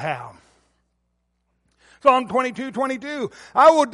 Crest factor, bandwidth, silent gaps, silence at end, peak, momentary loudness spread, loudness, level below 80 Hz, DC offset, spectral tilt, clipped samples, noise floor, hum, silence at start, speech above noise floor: 18 dB; 11.5 kHz; none; 0 s; -2 dBFS; 15 LU; -20 LUFS; -62 dBFS; under 0.1%; -4.5 dB/octave; under 0.1%; -71 dBFS; none; 0 s; 52 dB